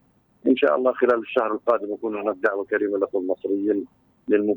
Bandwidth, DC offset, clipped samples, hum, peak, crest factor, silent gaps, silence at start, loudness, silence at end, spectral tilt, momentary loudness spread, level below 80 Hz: 20 kHz; under 0.1%; under 0.1%; none; -6 dBFS; 16 dB; none; 0.45 s; -23 LUFS; 0 s; -7.5 dB/octave; 8 LU; -70 dBFS